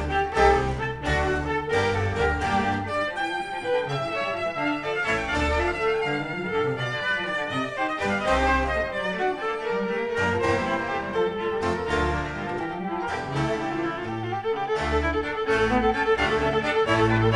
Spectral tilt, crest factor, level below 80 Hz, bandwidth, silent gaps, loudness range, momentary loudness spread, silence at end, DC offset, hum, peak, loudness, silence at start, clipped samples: -5.5 dB/octave; 18 dB; -38 dBFS; 11 kHz; none; 3 LU; 7 LU; 0 s; 0.1%; none; -6 dBFS; -25 LUFS; 0 s; under 0.1%